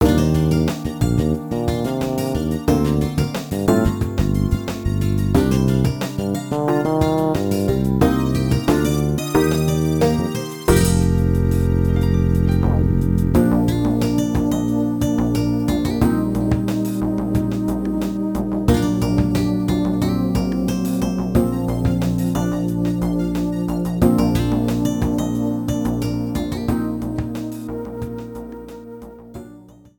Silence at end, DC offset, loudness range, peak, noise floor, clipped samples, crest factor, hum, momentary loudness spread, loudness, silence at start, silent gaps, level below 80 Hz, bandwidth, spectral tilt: 0.35 s; under 0.1%; 3 LU; -2 dBFS; -43 dBFS; under 0.1%; 18 dB; none; 6 LU; -19 LUFS; 0 s; none; -30 dBFS; 19 kHz; -7 dB/octave